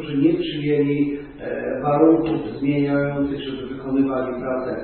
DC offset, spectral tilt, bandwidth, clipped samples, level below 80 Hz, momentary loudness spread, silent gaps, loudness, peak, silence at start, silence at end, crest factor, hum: under 0.1%; -12 dB/octave; 4.4 kHz; under 0.1%; -48 dBFS; 12 LU; none; -21 LUFS; -2 dBFS; 0 s; 0 s; 18 dB; none